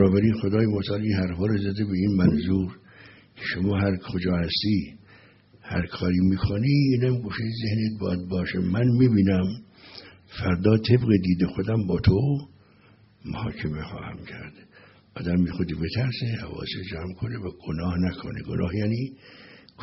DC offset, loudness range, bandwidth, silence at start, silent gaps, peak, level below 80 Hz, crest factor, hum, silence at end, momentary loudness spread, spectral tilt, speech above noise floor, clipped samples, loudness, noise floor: under 0.1%; 7 LU; 6 kHz; 0 s; none; -6 dBFS; -46 dBFS; 20 dB; none; 0 s; 15 LU; -7 dB/octave; 32 dB; under 0.1%; -25 LUFS; -56 dBFS